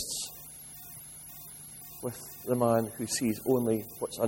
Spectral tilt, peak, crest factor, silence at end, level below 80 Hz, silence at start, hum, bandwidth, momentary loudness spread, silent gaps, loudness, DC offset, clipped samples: -4.5 dB/octave; -12 dBFS; 20 dB; 0 s; -64 dBFS; 0 s; none; 16.5 kHz; 16 LU; none; -31 LUFS; under 0.1%; under 0.1%